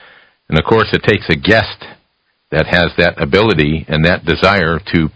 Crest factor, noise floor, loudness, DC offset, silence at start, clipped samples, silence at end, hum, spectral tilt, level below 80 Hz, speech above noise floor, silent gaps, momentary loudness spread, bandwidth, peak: 14 dB; -63 dBFS; -13 LUFS; under 0.1%; 0.5 s; 0.4%; 0.05 s; none; -7 dB/octave; -30 dBFS; 50 dB; none; 6 LU; 8 kHz; 0 dBFS